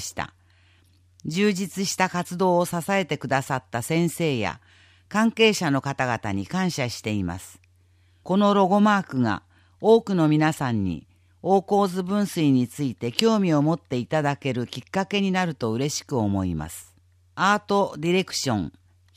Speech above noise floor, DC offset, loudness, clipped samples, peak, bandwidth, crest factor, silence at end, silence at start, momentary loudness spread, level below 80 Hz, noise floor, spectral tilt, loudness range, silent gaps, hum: 36 dB; under 0.1%; -23 LUFS; under 0.1%; 0 dBFS; 15.5 kHz; 24 dB; 0.45 s; 0 s; 11 LU; -56 dBFS; -59 dBFS; -5.5 dB/octave; 4 LU; none; none